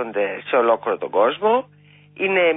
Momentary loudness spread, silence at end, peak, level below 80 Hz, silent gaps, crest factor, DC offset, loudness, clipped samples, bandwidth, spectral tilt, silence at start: 6 LU; 0 s; -6 dBFS; -72 dBFS; none; 14 dB; under 0.1%; -20 LUFS; under 0.1%; 3.9 kHz; -9 dB/octave; 0 s